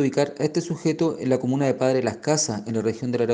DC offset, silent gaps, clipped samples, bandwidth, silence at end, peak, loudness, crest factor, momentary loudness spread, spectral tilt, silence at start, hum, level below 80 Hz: under 0.1%; none; under 0.1%; 10 kHz; 0 s; -6 dBFS; -24 LUFS; 16 dB; 4 LU; -5 dB/octave; 0 s; none; -64 dBFS